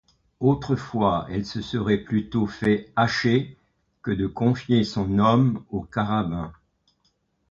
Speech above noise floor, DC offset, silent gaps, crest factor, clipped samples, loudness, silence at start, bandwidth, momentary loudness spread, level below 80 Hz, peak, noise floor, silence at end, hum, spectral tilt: 47 dB; under 0.1%; none; 18 dB; under 0.1%; -24 LUFS; 0.4 s; 7.6 kHz; 9 LU; -48 dBFS; -6 dBFS; -69 dBFS; 0.95 s; none; -7.5 dB/octave